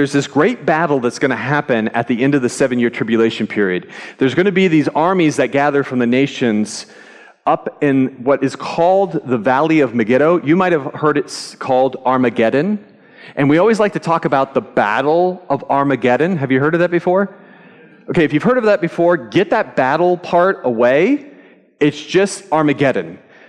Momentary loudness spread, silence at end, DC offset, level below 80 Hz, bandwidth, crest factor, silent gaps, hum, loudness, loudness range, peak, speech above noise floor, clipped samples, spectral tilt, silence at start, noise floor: 5 LU; 0.3 s; under 0.1%; -60 dBFS; 11.5 kHz; 12 dB; none; none; -15 LUFS; 2 LU; -4 dBFS; 29 dB; under 0.1%; -6 dB/octave; 0 s; -44 dBFS